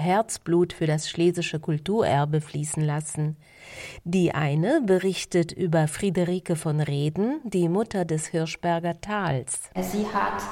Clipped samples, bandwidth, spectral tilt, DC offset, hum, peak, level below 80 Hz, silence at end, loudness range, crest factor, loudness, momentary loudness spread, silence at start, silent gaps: under 0.1%; 16 kHz; -6 dB/octave; under 0.1%; none; -10 dBFS; -56 dBFS; 0 s; 2 LU; 16 dB; -25 LUFS; 6 LU; 0 s; none